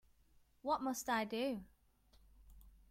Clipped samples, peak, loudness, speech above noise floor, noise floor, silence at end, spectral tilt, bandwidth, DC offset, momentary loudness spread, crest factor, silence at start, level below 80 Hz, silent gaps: under 0.1%; -26 dBFS; -40 LUFS; 31 dB; -70 dBFS; 0.2 s; -3.5 dB/octave; 16.5 kHz; under 0.1%; 9 LU; 18 dB; 0.65 s; -68 dBFS; none